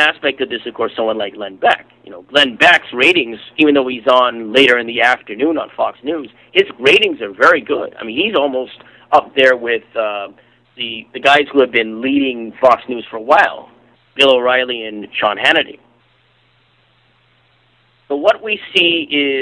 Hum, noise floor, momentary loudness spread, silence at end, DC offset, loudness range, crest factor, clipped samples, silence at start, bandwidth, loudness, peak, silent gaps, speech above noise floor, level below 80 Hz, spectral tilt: none; -55 dBFS; 13 LU; 0 s; under 0.1%; 6 LU; 16 dB; under 0.1%; 0 s; 11 kHz; -14 LUFS; 0 dBFS; none; 41 dB; -58 dBFS; -3.5 dB/octave